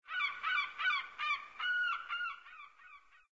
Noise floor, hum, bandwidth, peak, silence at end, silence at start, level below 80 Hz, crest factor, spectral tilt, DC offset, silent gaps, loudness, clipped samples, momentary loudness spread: -60 dBFS; none; 7.6 kHz; -24 dBFS; 0.35 s; 0.05 s; -82 dBFS; 16 dB; 6.5 dB/octave; under 0.1%; none; -35 LUFS; under 0.1%; 18 LU